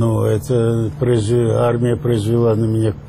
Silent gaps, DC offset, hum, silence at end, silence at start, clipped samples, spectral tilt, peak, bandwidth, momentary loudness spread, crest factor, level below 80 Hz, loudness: none; under 0.1%; none; 0 s; 0 s; under 0.1%; -8 dB/octave; -6 dBFS; 14.5 kHz; 2 LU; 10 dB; -40 dBFS; -17 LUFS